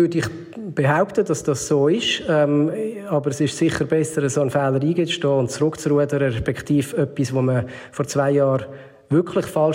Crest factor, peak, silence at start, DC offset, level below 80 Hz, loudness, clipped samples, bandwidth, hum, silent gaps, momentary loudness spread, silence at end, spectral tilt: 14 dB; -6 dBFS; 0 s; under 0.1%; -52 dBFS; -20 LUFS; under 0.1%; 16 kHz; none; none; 7 LU; 0 s; -5.5 dB/octave